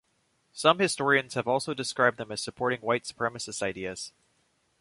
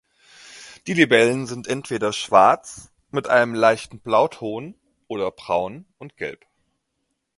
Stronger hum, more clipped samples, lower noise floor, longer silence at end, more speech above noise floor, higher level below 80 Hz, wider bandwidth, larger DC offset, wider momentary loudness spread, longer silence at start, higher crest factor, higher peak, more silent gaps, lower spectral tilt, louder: neither; neither; about the same, -72 dBFS vs -75 dBFS; second, 0.7 s vs 1.05 s; second, 44 dB vs 55 dB; second, -66 dBFS vs -60 dBFS; about the same, 11.5 kHz vs 11.5 kHz; neither; second, 12 LU vs 21 LU; about the same, 0.55 s vs 0.55 s; about the same, 24 dB vs 22 dB; second, -6 dBFS vs 0 dBFS; neither; about the same, -3.5 dB/octave vs -4.5 dB/octave; second, -28 LUFS vs -20 LUFS